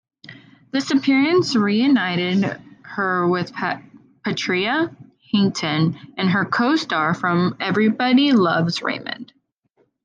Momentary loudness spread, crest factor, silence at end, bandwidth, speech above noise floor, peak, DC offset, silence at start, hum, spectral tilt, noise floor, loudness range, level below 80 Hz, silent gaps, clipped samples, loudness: 10 LU; 14 dB; 0.8 s; 9.2 kHz; 46 dB; -6 dBFS; under 0.1%; 0.3 s; none; -5.5 dB/octave; -65 dBFS; 4 LU; -68 dBFS; none; under 0.1%; -20 LUFS